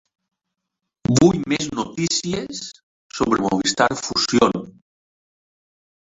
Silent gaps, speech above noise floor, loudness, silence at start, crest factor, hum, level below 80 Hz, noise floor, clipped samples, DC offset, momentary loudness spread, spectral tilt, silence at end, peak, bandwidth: 2.83-3.10 s; 61 dB; -20 LUFS; 1.1 s; 20 dB; none; -50 dBFS; -81 dBFS; under 0.1%; under 0.1%; 14 LU; -4 dB/octave; 1.45 s; -2 dBFS; 8 kHz